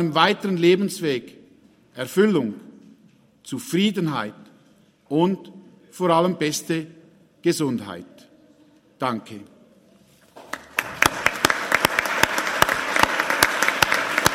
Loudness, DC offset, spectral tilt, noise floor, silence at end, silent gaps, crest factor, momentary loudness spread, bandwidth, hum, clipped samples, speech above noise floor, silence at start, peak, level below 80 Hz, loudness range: -21 LUFS; under 0.1%; -3.5 dB/octave; -56 dBFS; 0 s; none; 24 dB; 15 LU; 16.5 kHz; none; under 0.1%; 35 dB; 0 s; 0 dBFS; -54 dBFS; 10 LU